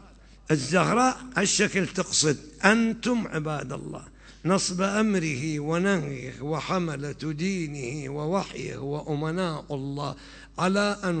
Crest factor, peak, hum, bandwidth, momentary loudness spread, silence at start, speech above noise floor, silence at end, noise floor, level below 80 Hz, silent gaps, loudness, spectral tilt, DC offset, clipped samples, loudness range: 22 dB; -4 dBFS; none; 9.2 kHz; 12 LU; 0 s; 22 dB; 0 s; -48 dBFS; -52 dBFS; none; -26 LUFS; -4.5 dB/octave; under 0.1%; under 0.1%; 7 LU